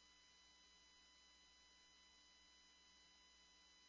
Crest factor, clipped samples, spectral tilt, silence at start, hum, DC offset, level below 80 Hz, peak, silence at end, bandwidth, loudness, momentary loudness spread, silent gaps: 12 dB; under 0.1%; -0.5 dB/octave; 0 s; none; under 0.1%; -86 dBFS; -58 dBFS; 0 s; 8 kHz; -68 LUFS; 0 LU; none